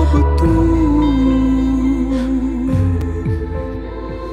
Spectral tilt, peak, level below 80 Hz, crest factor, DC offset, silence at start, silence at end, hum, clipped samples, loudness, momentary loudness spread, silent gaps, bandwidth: -9 dB/octave; -4 dBFS; -20 dBFS; 12 dB; under 0.1%; 0 s; 0 s; none; under 0.1%; -16 LUFS; 11 LU; none; 9.4 kHz